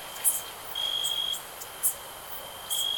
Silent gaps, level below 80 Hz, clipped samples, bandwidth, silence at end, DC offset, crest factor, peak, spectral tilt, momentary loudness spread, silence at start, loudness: none; -62 dBFS; under 0.1%; 19.5 kHz; 0 s; under 0.1%; 24 dB; -8 dBFS; 1.5 dB/octave; 12 LU; 0 s; -29 LUFS